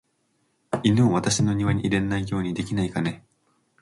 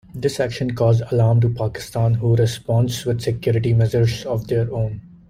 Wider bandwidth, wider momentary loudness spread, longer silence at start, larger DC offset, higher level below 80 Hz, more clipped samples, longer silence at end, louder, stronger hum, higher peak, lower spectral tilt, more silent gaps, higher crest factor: second, 11.5 kHz vs 14 kHz; about the same, 9 LU vs 7 LU; first, 0.7 s vs 0.1 s; neither; about the same, -48 dBFS vs -44 dBFS; neither; first, 0.6 s vs 0.2 s; second, -24 LUFS vs -20 LUFS; neither; second, -8 dBFS vs -4 dBFS; second, -5.5 dB/octave vs -7 dB/octave; neither; about the same, 16 dB vs 14 dB